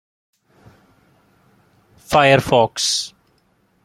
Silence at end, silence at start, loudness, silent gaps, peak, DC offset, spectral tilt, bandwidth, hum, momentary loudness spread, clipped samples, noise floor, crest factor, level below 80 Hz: 0.75 s; 2.1 s; -16 LUFS; none; 0 dBFS; under 0.1%; -3.5 dB/octave; 15.5 kHz; none; 8 LU; under 0.1%; -61 dBFS; 20 dB; -50 dBFS